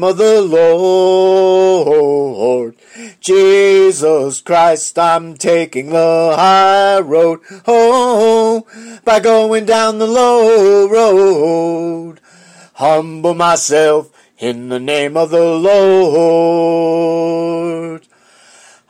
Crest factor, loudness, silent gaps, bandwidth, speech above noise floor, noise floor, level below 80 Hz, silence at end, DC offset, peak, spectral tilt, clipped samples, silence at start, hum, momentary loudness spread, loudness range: 10 dB; -11 LUFS; none; 12 kHz; 34 dB; -45 dBFS; -58 dBFS; 0.9 s; under 0.1%; -2 dBFS; -4 dB/octave; under 0.1%; 0 s; none; 10 LU; 3 LU